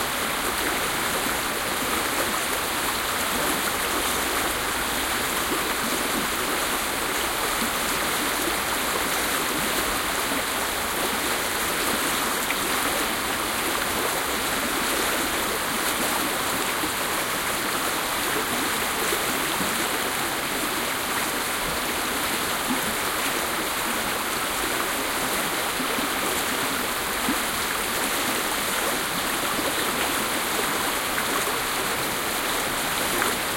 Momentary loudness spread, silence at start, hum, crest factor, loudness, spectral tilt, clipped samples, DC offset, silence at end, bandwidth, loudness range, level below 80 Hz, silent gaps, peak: 2 LU; 0 s; none; 18 dB; -24 LUFS; -1.5 dB/octave; under 0.1%; under 0.1%; 0 s; 16.5 kHz; 1 LU; -48 dBFS; none; -8 dBFS